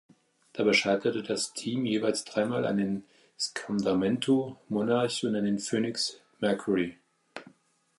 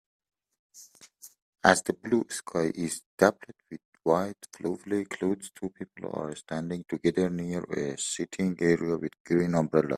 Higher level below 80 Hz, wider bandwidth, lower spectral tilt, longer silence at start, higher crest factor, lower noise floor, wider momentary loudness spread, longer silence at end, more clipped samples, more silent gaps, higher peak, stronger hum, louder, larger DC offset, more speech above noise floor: about the same, -68 dBFS vs -64 dBFS; second, 11.5 kHz vs 15 kHz; about the same, -4.5 dB/octave vs -5 dB/octave; second, 0.55 s vs 0.75 s; second, 18 dB vs 28 dB; first, -65 dBFS vs -54 dBFS; second, 9 LU vs 13 LU; first, 0.5 s vs 0 s; neither; second, none vs 1.42-1.53 s, 3.06-3.18 s, 3.85-3.92 s, 9.20-9.25 s; second, -12 dBFS vs -2 dBFS; neither; about the same, -29 LUFS vs -29 LUFS; neither; first, 36 dB vs 25 dB